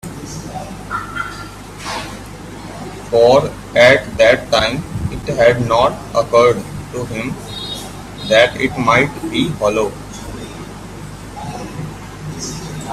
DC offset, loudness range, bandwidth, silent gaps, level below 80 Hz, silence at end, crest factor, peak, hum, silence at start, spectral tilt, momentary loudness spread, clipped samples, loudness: under 0.1%; 9 LU; 14.5 kHz; none; -38 dBFS; 0 s; 16 dB; 0 dBFS; none; 0.05 s; -4.5 dB/octave; 19 LU; under 0.1%; -15 LUFS